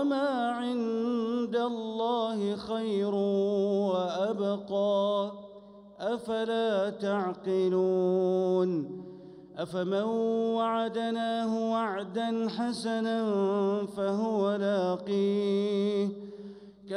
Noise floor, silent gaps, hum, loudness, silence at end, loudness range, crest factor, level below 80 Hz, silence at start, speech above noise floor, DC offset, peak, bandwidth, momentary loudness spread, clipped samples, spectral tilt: -50 dBFS; none; none; -29 LUFS; 0 s; 2 LU; 12 dB; -74 dBFS; 0 s; 22 dB; under 0.1%; -18 dBFS; 11 kHz; 8 LU; under 0.1%; -7 dB/octave